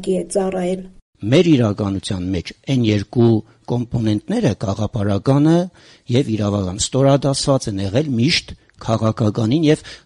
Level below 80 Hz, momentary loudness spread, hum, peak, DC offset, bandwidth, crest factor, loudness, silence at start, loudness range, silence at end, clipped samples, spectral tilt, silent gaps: -44 dBFS; 8 LU; none; -4 dBFS; under 0.1%; 11.5 kHz; 14 dB; -18 LUFS; 0 s; 2 LU; 0.1 s; under 0.1%; -6 dB/octave; 1.02-1.13 s